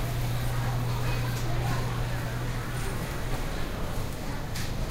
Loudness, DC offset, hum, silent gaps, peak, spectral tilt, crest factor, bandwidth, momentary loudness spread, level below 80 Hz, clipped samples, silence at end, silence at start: -32 LUFS; under 0.1%; none; none; -16 dBFS; -5.5 dB/octave; 14 dB; 16 kHz; 5 LU; -34 dBFS; under 0.1%; 0 s; 0 s